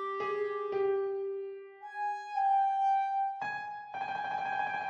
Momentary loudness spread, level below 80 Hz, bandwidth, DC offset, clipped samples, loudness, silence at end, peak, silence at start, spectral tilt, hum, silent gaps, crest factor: 12 LU; -78 dBFS; 7 kHz; under 0.1%; under 0.1%; -33 LUFS; 0 s; -22 dBFS; 0 s; -5 dB/octave; none; none; 12 dB